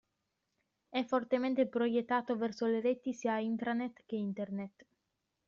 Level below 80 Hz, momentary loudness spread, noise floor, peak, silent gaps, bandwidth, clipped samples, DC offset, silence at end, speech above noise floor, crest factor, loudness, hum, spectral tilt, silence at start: -78 dBFS; 8 LU; -85 dBFS; -18 dBFS; none; 7.4 kHz; under 0.1%; under 0.1%; 0.8 s; 50 dB; 16 dB; -35 LUFS; none; -4.5 dB/octave; 0.9 s